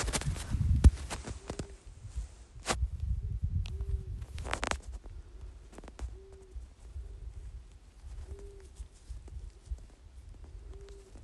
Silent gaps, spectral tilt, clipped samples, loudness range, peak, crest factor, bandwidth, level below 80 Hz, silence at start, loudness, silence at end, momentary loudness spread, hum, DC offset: none; -5 dB/octave; under 0.1%; 16 LU; -8 dBFS; 26 dB; 12 kHz; -38 dBFS; 0 s; -36 LUFS; 0 s; 18 LU; none; under 0.1%